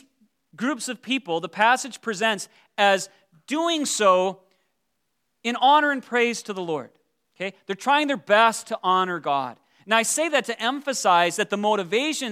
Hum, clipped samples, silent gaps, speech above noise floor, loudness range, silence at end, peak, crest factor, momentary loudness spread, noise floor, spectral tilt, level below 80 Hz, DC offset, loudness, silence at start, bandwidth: none; under 0.1%; none; 54 dB; 2 LU; 0 s; -4 dBFS; 20 dB; 12 LU; -77 dBFS; -2.5 dB/octave; -86 dBFS; under 0.1%; -22 LUFS; 0.6 s; 15.5 kHz